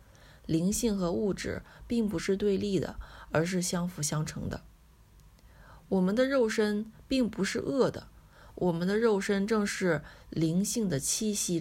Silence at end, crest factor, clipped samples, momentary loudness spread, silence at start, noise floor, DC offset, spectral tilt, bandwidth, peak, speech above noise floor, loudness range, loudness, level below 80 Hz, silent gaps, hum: 0 s; 16 dB; under 0.1%; 9 LU; 0.25 s; -57 dBFS; under 0.1%; -5 dB/octave; 16 kHz; -14 dBFS; 28 dB; 3 LU; -30 LUFS; -52 dBFS; none; none